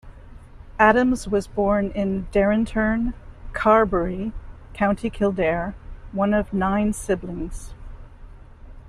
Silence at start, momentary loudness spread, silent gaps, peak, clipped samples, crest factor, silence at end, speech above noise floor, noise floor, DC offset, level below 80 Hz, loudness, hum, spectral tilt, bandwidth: 0.05 s; 17 LU; none; -2 dBFS; under 0.1%; 20 dB; 0 s; 21 dB; -42 dBFS; under 0.1%; -38 dBFS; -22 LUFS; none; -6.5 dB/octave; 12.5 kHz